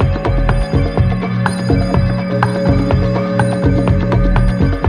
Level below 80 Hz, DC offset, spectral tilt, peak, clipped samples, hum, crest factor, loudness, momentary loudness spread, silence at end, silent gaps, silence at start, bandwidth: -20 dBFS; under 0.1%; -8 dB/octave; 0 dBFS; under 0.1%; none; 12 dB; -15 LUFS; 3 LU; 0 s; none; 0 s; 9.8 kHz